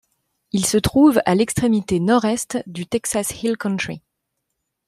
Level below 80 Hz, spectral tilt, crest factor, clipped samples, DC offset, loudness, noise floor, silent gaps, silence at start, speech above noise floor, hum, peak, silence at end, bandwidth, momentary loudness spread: -46 dBFS; -5 dB/octave; 18 dB; under 0.1%; under 0.1%; -19 LUFS; -77 dBFS; none; 0.55 s; 58 dB; none; -2 dBFS; 0.9 s; 15.5 kHz; 12 LU